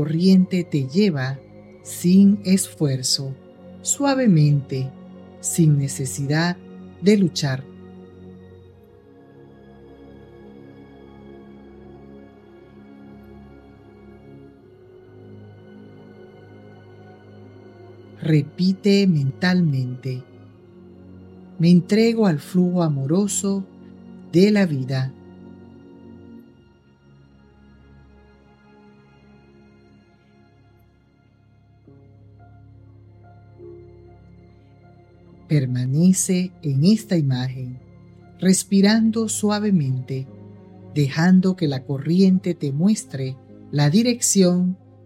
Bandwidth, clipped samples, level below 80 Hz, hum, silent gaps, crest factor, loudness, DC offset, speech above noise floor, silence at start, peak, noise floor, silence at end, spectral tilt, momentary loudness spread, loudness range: 14 kHz; under 0.1%; -60 dBFS; none; none; 20 dB; -20 LUFS; under 0.1%; 38 dB; 0 s; -2 dBFS; -56 dBFS; 0.3 s; -5.5 dB/octave; 19 LU; 6 LU